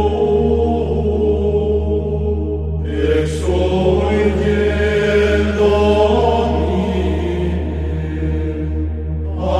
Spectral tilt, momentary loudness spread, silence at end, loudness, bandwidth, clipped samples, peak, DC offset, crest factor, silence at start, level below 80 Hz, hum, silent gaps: -7.5 dB/octave; 8 LU; 0 s; -17 LUFS; 9.8 kHz; under 0.1%; -2 dBFS; under 0.1%; 14 dB; 0 s; -26 dBFS; none; none